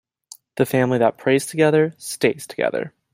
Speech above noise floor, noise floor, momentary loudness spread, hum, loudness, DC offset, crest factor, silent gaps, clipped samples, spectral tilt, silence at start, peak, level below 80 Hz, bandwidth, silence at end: 28 dB; -48 dBFS; 7 LU; none; -20 LUFS; under 0.1%; 18 dB; none; under 0.1%; -5.5 dB/octave; 0.55 s; -2 dBFS; -62 dBFS; 16 kHz; 0.25 s